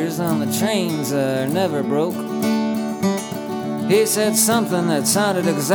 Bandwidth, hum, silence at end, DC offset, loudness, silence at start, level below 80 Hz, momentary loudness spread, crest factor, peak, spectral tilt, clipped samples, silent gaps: over 20 kHz; none; 0 s; under 0.1%; -19 LUFS; 0 s; -66 dBFS; 7 LU; 16 dB; -4 dBFS; -4.5 dB/octave; under 0.1%; none